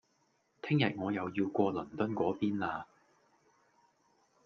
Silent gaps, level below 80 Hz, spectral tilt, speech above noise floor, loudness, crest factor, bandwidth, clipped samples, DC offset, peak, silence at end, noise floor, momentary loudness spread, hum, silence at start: none; -74 dBFS; -8 dB/octave; 42 dB; -34 LUFS; 20 dB; 6.6 kHz; under 0.1%; under 0.1%; -16 dBFS; 1.6 s; -75 dBFS; 10 LU; none; 0.65 s